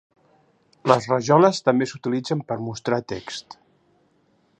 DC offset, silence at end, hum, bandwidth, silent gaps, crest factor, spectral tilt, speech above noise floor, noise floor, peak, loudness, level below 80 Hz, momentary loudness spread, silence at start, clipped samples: under 0.1%; 1.2 s; none; 9.6 kHz; none; 22 dB; -6 dB/octave; 42 dB; -63 dBFS; 0 dBFS; -22 LUFS; -62 dBFS; 15 LU; 0.85 s; under 0.1%